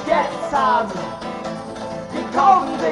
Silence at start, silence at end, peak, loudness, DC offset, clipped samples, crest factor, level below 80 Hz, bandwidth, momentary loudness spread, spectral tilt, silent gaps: 0 s; 0 s; -2 dBFS; -20 LUFS; under 0.1%; under 0.1%; 16 dB; -52 dBFS; 11.5 kHz; 15 LU; -5 dB/octave; none